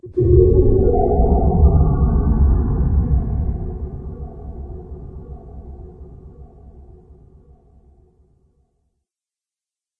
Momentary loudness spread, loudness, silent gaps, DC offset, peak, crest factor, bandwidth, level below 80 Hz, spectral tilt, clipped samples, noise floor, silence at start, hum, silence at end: 23 LU; -17 LUFS; none; under 0.1%; 0 dBFS; 18 dB; 1.8 kHz; -22 dBFS; -15 dB/octave; under 0.1%; under -90 dBFS; 0 s; none; 3.3 s